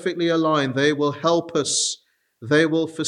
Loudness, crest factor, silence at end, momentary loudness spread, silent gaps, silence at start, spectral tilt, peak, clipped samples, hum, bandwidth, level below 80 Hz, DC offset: -20 LUFS; 18 dB; 0 s; 4 LU; none; 0 s; -3.5 dB/octave; -4 dBFS; under 0.1%; none; 11.5 kHz; -70 dBFS; under 0.1%